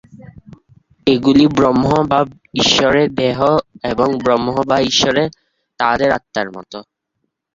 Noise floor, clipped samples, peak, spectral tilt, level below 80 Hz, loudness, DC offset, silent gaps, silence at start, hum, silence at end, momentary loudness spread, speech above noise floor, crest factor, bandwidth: -72 dBFS; under 0.1%; -2 dBFS; -4.5 dB/octave; -44 dBFS; -15 LUFS; under 0.1%; none; 0.15 s; none; 0.75 s; 11 LU; 58 dB; 14 dB; 7.6 kHz